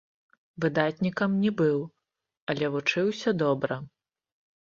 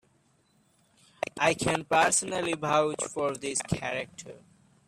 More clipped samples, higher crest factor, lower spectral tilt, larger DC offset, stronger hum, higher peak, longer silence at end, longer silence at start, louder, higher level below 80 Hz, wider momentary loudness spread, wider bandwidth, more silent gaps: neither; about the same, 20 dB vs 20 dB; first, -6.5 dB/octave vs -3 dB/octave; neither; neither; about the same, -10 dBFS vs -10 dBFS; first, 0.8 s vs 0.5 s; second, 0.6 s vs 1.35 s; about the same, -27 LUFS vs -28 LUFS; second, -66 dBFS vs -60 dBFS; second, 10 LU vs 14 LU; second, 7.4 kHz vs 14.5 kHz; first, 2.37-2.47 s vs none